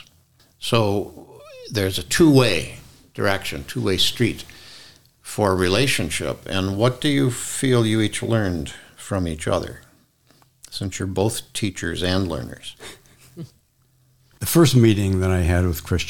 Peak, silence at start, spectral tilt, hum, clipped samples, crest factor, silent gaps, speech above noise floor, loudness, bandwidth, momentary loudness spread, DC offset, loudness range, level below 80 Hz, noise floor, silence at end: -2 dBFS; 0 s; -5 dB/octave; none; under 0.1%; 20 dB; none; 40 dB; -21 LUFS; 18.5 kHz; 20 LU; 0.7%; 6 LU; -42 dBFS; -61 dBFS; 0 s